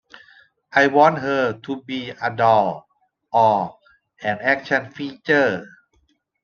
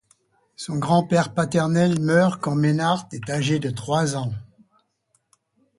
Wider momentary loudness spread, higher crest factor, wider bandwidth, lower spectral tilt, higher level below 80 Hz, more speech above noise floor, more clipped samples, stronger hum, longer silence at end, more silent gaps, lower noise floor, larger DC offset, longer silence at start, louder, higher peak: first, 14 LU vs 10 LU; about the same, 20 dB vs 18 dB; second, 7 kHz vs 11.5 kHz; about the same, -6 dB/octave vs -6 dB/octave; second, -66 dBFS vs -58 dBFS; about the same, 45 dB vs 48 dB; neither; neither; second, 0.75 s vs 1.35 s; neither; second, -65 dBFS vs -69 dBFS; neither; first, 0.75 s vs 0.6 s; about the same, -20 LUFS vs -22 LUFS; about the same, -2 dBFS vs -4 dBFS